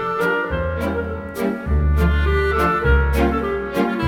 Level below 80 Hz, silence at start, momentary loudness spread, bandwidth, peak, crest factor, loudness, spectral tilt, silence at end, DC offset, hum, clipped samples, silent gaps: -22 dBFS; 0 s; 7 LU; 15.5 kHz; -4 dBFS; 14 dB; -20 LUFS; -7.5 dB/octave; 0 s; under 0.1%; none; under 0.1%; none